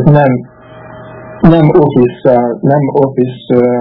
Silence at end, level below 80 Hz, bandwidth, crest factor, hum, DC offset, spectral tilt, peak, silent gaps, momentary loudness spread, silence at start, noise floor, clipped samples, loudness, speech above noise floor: 0 s; -36 dBFS; 4.3 kHz; 10 dB; none; under 0.1%; -11.5 dB/octave; 0 dBFS; none; 11 LU; 0 s; -31 dBFS; 2%; -10 LUFS; 23 dB